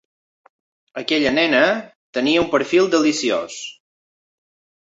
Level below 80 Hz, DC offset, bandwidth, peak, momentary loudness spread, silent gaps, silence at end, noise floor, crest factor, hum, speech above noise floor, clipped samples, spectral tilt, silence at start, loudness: -58 dBFS; under 0.1%; 8 kHz; -2 dBFS; 15 LU; 1.95-2.13 s; 1.15 s; under -90 dBFS; 18 dB; none; over 72 dB; under 0.1%; -3.5 dB/octave; 0.95 s; -18 LUFS